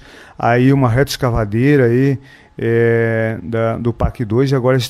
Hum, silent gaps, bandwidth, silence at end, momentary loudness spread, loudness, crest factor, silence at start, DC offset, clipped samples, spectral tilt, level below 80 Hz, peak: none; none; 14.5 kHz; 0 s; 7 LU; -15 LUFS; 14 dB; 0.2 s; under 0.1%; under 0.1%; -7 dB/octave; -34 dBFS; -2 dBFS